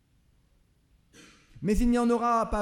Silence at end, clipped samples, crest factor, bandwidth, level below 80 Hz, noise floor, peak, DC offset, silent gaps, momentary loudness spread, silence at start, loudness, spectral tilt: 0 s; under 0.1%; 14 dB; 14.5 kHz; -40 dBFS; -65 dBFS; -14 dBFS; under 0.1%; none; 6 LU; 1.55 s; -26 LUFS; -6.5 dB/octave